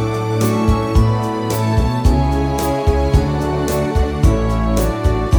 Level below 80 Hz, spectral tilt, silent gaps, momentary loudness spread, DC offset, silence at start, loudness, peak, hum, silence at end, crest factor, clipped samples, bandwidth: -20 dBFS; -7 dB/octave; none; 3 LU; under 0.1%; 0 s; -17 LUFS; -2 dBFS; none; 0 s; 14 dB; under 0.1%; over 20 kHz